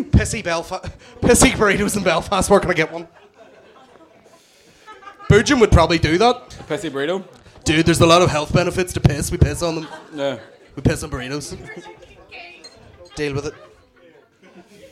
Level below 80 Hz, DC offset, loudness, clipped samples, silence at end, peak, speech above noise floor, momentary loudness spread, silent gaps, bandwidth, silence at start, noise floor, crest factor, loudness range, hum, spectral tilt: -32 dBFS; under 0.1%; -18 LUFS; under 0.1%; 0.05 s; -2 dBFS; 33 dB; 21 LU; none; 16 kHz; 0 s; -51 dBFS; 18 dB; 11 LU; none; -5 dB/octave